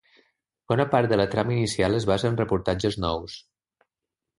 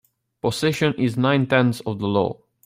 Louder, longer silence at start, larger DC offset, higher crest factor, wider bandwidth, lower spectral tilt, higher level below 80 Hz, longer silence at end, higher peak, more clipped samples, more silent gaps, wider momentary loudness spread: second, -24 LUFS vs -21 LUFS; first, 0.7 s vs 0.45 s; neither; about the same, 20 dB vs 16 dB; second, 11.5 kHz vs 16 kHz; about the same, -6 dB/octave vs -6 dB/octave; first, -46 dBFS vs -58 dBFS; first, 1 s vs 0.3 s; about the same, -6 dBFS vs -4 dBFS; neither; neither; about the same, 7 LU vs 8 LU